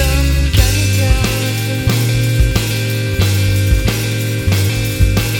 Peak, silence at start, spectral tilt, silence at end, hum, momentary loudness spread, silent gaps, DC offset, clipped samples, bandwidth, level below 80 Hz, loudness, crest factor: 0 dBFS; 0 s; -4.5 dB/octave; 0 s; none; 4 LU; none; 0.4%; under 0.1%; 17.5 kHz; -18 dBFS; -15 LUFS; 14 dB